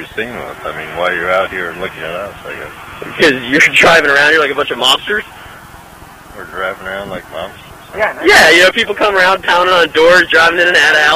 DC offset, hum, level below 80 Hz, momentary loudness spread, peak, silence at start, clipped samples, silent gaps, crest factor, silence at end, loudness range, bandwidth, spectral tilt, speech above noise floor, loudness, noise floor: under 0.1%; none; -44 dBFS; 20 LU; 0 dBFS; 0 s; under 0.1%; none; 12 dB; 0 s; 10 LU; 16 kHz; -2.5 dB/octave; 24 dB; -9 LUFS; -36 dBFS